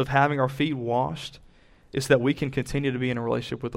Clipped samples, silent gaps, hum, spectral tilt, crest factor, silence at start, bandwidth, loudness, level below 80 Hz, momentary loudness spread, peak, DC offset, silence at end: under 0.1%; none; none; -6 dB/octave; 20 dB; 0 s; 16 kHz; -26 LUFS; -50 dBFS; 10 LU; -6 dBFS; under 0.1%; 0 s